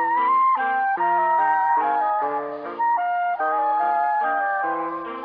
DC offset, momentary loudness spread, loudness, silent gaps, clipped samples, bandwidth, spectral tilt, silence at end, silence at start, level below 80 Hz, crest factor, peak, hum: under 0.1%; 6 LU; -21 LUFS; none; under 0.1%; 5 kHz; -7 dB/octave; 0 s; 0 s; -70 dBFS; 10 dB; -10 dBFS; none